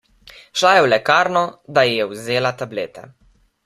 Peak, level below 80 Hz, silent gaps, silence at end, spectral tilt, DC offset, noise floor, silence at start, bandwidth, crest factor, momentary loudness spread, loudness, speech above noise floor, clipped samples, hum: 0 dBFS; -60 dBFS; none; 0.65 s; -3.5 dB/octave; under 0.1%; -46 dBFS; 0.55 s; 15 kHz; 18 dB; 13 LU; -17 LUFS; 28 dB; under 0.1%; none